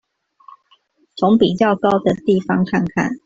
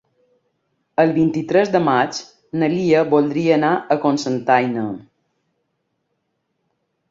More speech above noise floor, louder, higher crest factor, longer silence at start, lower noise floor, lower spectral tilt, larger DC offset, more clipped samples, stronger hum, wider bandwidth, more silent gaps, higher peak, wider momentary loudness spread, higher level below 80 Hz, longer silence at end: second, 42 dB vs 55 dB; about the same, -17 LUFS vs -18 LUFS; about the same, 16 dB vs 18 dB; first, 1.15 s vs 1 s; second, -58 dBFS vs -72 dBFS; about the same, -7 dB/octave vs -6 dB/octave; neither; neither; neither; about the same, 7.8 kHz vs 7.8 kHz; neither; about the same, -2 dBFS vs -2 dBFS; second, 6 LU vs 10 LU; first, -52 dBFS vs -62 dBFS; second, 0.1 s vs 2.1 s